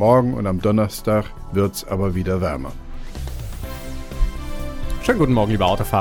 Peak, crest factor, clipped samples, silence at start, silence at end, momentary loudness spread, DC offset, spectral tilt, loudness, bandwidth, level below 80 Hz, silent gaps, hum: -4 dBFS; 16 dB; under 0.1%; 0 s; 0 s; 15 LU; under 0.1%; -6.5 dB/octave; -21 LUFS; over 20 kHz; -28 dBFS; none; none